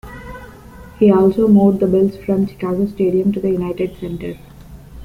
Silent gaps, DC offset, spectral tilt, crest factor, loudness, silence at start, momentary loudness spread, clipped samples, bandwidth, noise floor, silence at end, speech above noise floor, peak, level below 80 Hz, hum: none; under 0.1%; -9.5 dB/octave; 14 dB; -16 LUFS; 0.05 s; 22 LU; under 0.1%; 5 kHz; -38 dBFS; 0 s; 23 dB; -2 dBFS; -42 dBFS; none